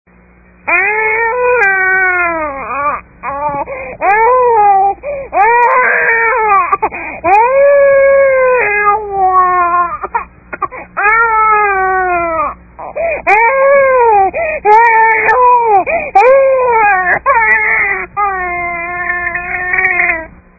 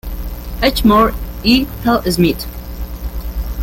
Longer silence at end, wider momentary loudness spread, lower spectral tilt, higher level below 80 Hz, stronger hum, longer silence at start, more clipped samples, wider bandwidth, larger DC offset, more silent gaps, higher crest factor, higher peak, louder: first, 0.3 s vs 0 s; second, 11 LU vs 16 LU; first, -7 dB/octave vs -5.5 dB/octave; second, -40 dBFS vs -24 dBFS; second, none vs 60 Hz at -30 dBFS; first, 0.65 s vs 0.05 s; first, 0.1% vs under 0.1%; second, 7.4 kHz vs 17 kHz; neither; neither; second, 10 dB vs 16 dB; about the same, 0 dBFS vs 0 dBFS; first, -10 LUFS vs -15 LUFS